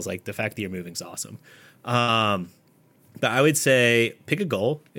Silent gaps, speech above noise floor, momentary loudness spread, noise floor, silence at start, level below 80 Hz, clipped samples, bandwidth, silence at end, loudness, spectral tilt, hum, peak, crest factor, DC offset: none; 34 dB; 16 LU; -59 dBFS; 0 s; -72 dBFS; under 0.1%; 17 kHz; 0 s; -23 LUFS; -4 dB/octave; none; -6 dBFS; 20 dB; under 0.1%